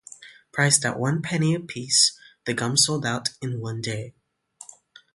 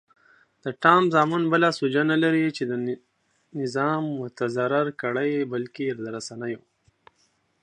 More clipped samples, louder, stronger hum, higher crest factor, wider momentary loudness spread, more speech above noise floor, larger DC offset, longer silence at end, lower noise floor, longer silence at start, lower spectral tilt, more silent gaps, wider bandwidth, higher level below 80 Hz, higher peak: neither; about the same, -22 LUFS vs -24 LUFS; neither; about the same, 22 dB vs 24 dB; about the same, 16 LU vs 15 LU; second, 27 dB vs 44 dB; neither; second, 0.5 s vs 1.05 s; second, -51 dBFS vs -68 dBFS; second, 0.1 s vs 0.65 s; second, -3 dB/octave vs -6 dB/octave; neither; first, 12 kHz vs 10.5 kHz; first, -64 dBFS vs -74 dBFS; about the same, -4 dBFS vs -2 dBFS